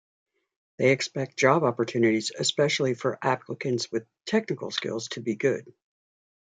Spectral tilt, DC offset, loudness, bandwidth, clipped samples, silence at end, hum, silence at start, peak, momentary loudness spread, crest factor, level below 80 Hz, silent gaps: -4.5 dB/octave; under 0.1%; -26 LUFS; 9.4 kHz; under 0.1%; 0.85 s; none; 0.8 s; -6 dBFS; 9 LU; 22 dB; -74 dBFS; none